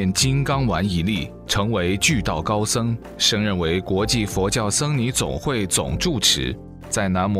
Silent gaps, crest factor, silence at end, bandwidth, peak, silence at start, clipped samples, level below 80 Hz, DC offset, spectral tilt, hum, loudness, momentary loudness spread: none; 16 dB; 0 s; 16 kHz; -4 dBFS; 0 s; under 0.1%; -38 dBFS; under 0.1%; -4 dB/octave; none; -21 LUFS; 6 LU